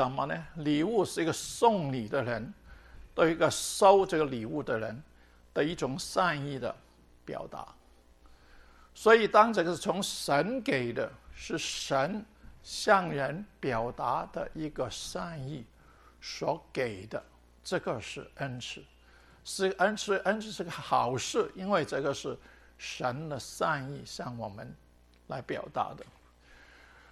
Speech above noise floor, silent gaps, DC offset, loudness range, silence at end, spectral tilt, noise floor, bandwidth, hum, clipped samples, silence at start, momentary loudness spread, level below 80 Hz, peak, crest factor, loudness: 28 dB; none; under 0.1%; 9 LU; 0.55 s; -4.5 dB/octave; -59 dBFS; 13 kHz; none; under 0.1%; 0 s; 16 LU; -58 dBFS; -8 dBFS; 24 dB; -31 LUFS